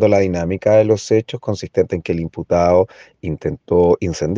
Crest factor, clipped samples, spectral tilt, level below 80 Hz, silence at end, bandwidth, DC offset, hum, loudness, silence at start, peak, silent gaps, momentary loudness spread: 16 dB; under 0.1%; -7 dB/octave; -42 dBFS; 0 s; 7.8 kHz; under 0.1%; none; -17 LUFS; 0 s; -2 dBFS; none; 10 LU